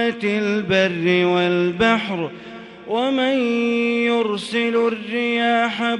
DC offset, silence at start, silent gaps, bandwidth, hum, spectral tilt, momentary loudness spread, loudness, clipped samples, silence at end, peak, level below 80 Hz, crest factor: under 0.1%; 0 s; none; 11 kHz; none; -5.5 dB/octave; 8 LU; -19 LUFS; under 0.1%; 0 s; -4 dBFS; -56 dBFS; 14 dB